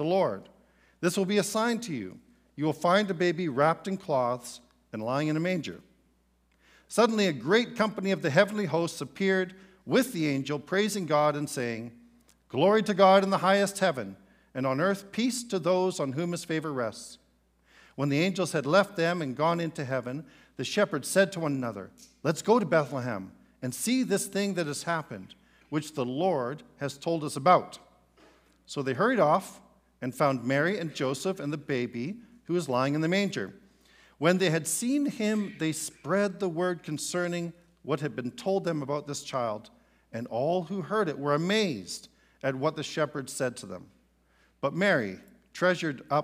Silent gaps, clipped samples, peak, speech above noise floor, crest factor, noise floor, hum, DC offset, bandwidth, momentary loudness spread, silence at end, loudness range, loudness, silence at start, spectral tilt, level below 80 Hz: none; under 0.1%; -6 dBFS; 40 dB; 22 dB; -68 dBFS; none; under 0.1%; 15.5 kHz; 14 LU; 0 s; 5 LU; -28 LUFS; 0 s; -5 dB/octave; -70 dBFS